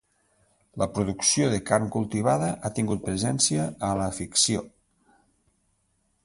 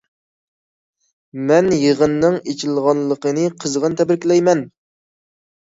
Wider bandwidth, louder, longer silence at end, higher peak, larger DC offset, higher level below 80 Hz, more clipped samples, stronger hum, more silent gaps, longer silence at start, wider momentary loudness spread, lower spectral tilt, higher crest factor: first, 11.5 kHz vs 8 kHz; second, -25 LUFS vs -17 LUFS; first, 1.55 s vs 0.95 s; second, -6 dBFS vs -2 dBFS; neither; about the same, -52 dBFS vs -56 dBFS; neither; neither; neither; second, 0.75 s vs 1.35 s; about the same, 7 LU vs 7 LU; second, -4 dB/octave vs -5.5 dB/octave; about the same, 22 dB vs 18 dB